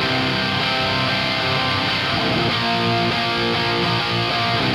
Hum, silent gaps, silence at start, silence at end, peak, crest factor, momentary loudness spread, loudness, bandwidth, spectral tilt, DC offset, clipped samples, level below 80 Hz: none; none; 0 s; 0 s; -8 dBFS; 12 dB; 1 LU; -19 LUFS; 15.5 kHz; -5 dB/octave; under 0.1%; under 0.1%; -44 dBFS